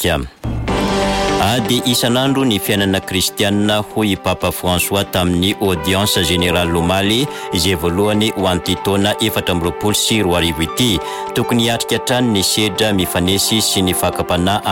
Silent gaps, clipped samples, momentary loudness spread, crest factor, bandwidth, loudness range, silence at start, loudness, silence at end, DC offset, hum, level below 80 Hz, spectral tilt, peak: none; under 0.1%; 4 LU; 12 dB; 17 kHz; 1 LU; 0 s; -15 LUFS; 0 s; under 0.1%; none; -34 dBFS; -4 dB/octave; -4 dBFS